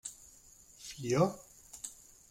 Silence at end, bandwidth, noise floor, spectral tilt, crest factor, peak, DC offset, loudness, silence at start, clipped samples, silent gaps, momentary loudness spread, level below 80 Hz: 0.35 s; 16 kHz; -59 dBFS; -5.5 dB/octave; 22 dB; -16 dBFS; under 0.1%; -35 LUFS; 0.05 s; under 0.1%; none; 25 LU; -66 dBFS